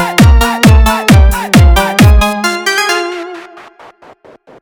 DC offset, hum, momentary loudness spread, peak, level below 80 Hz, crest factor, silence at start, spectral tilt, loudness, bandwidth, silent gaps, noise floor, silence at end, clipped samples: under 0.1%; none; 11 LU; 0 dBFS; -12 dBFS; 8 dB; 0 s; -5 dB/octave; -8 LUFS; over 20 kHz; none; -39 dBFS; 1 s; 0.2%